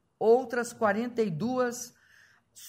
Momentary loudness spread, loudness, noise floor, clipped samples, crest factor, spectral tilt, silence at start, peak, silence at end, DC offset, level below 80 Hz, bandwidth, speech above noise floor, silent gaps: 10 LU; -28 LUFS; -61 dBFS; under 0.1%; 18 dB; -5 dB/octave; 0.2 s; -12 dBFS; 0 s; under 0.1%; -74 dBFS; 16 kHz; 34 dB; none